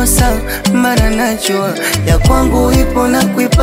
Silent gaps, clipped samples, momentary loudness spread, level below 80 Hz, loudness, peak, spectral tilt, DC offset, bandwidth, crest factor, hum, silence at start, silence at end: none; under 0.1%; 4 LU; -16 dBFS; -12 LUFS; 0 dBFS; -4.5 dB/octave; under 0.1%; 16.5 kHz; 10 dB; none; 0 s; 0 s